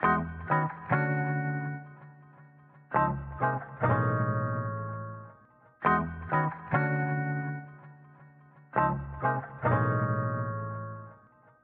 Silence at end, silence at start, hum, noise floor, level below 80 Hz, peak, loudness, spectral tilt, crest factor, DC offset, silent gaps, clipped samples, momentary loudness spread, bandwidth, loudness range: 0.45 s; 0 s; none; -59 dBFS; -54 dBFS; -12 dBFS; -30 LUFS; -7.5 dB/octave; 18 dB; under 0.1%; none; under 0.1%; 14 LU; 4.1 kHz; 1 LU